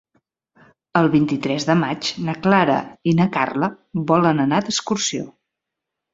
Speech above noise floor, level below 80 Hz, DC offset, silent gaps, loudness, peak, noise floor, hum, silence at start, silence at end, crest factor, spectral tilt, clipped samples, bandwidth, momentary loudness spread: 64 dB; -58 dBFS; under 0.1%; none; -19 LUFS; -2 dBFS; -83 dBFS; none; 0.95 s; 0.85 s; 18 dB; -5 dB/octave; under 0.1%; 7.8 kHz; 7 LU